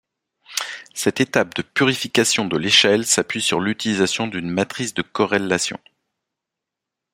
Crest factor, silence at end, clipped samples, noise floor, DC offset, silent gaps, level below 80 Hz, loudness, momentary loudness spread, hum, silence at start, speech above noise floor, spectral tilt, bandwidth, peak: 20 dB; 1.35 s; under 0.1%; -84 dBFS; under 0.1%; none; -62 dBFS; -19 LUFS; 11 LU; none; 0.5 s; 64 dB; -3 dB/octave; 16 kHz; 0 dBFS